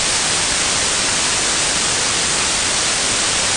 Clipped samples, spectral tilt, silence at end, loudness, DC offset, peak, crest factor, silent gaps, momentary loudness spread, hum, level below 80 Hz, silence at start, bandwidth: under 0.1%; 0 dB/octave; 0 s; -15 LUFS; under 0.1%; -4 dBFS; 12 dB; none; 0 LU; none; -40 dBFS; 0 s; 11 kHz